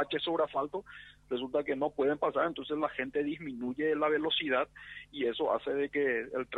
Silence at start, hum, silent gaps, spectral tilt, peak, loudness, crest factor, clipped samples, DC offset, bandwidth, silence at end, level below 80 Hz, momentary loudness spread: 0 s; 50 Hz at -65 dBFS; none; -6.5 dB/octave; -16 dBFS; -32 LUFS; 16 dB; under 0.1%; under 0.1%; 4.5 kHz; 0 s; -66 dBFS; 9 LU